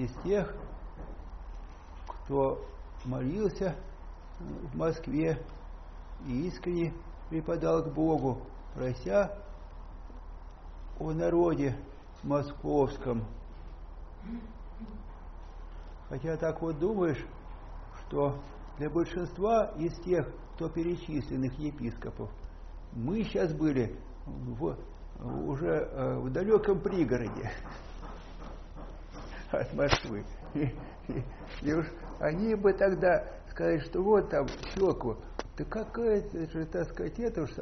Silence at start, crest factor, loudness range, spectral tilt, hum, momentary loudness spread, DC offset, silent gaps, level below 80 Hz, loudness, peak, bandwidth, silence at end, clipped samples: 0 s; 26 dB; 6 LU; -6.5 dB/octave; none; 21 LU; under 0.1%; none; -44 dBFS; -32 LUFS; -6 dBFS; 6.4 kHz; 0 s; under 0.1%